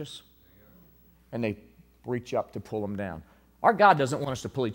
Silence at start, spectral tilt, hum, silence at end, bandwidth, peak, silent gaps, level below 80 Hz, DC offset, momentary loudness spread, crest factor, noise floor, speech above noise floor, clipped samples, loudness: 0 s; -5.5 dB/octave; none; 0 s; 16 kHz; -6 dBFS; none; -60 dBFS; under 0.1%; 22 LU; 24 dB; -58 dBFS; 32 dB; under 0.1%; -27 LUFS